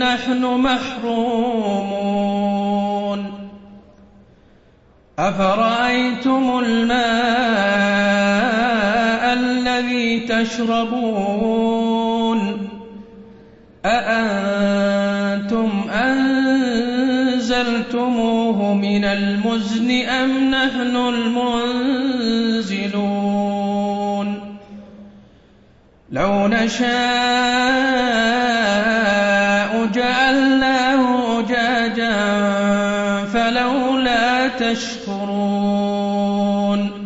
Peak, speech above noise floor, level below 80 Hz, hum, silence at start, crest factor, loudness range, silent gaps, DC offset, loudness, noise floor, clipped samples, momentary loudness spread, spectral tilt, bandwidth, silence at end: -4 dBFS; 34 dB; -48 dBFS; none; 0 s; 14 dB; 6 LU; none; under 0.1%; -18 LUFS; -51 dBFS; under 0.1%; 5 LU; -5 dB/octave; 8 kHz; 0 s